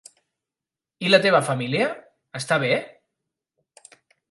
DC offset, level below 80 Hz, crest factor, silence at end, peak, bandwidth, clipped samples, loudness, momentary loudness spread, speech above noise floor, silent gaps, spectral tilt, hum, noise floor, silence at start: under 0.1%; -74 dBFS; 24 dB; 1.45 s; -2 dBFS; 11.5 kHz; under 0.1%; -21 LUFS; 17 LU; 68 dB; none; -4.5 dB/octave; none; -89 dBFS; 1 s